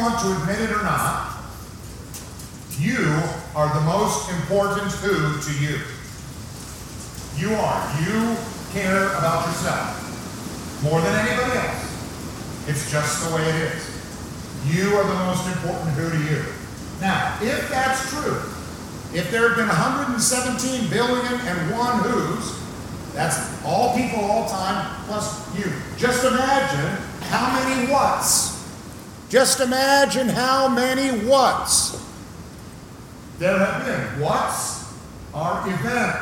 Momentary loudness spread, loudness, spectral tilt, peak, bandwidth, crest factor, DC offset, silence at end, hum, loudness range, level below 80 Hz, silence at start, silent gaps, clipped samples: 16 LU; -22 LUFS; -4 dB/octave; -2 dBFS; 17 kHz; 20 dB; under 0.1%; 0 s; none; 6 LU; -46 dBFS; 0 s; none; under 0.1%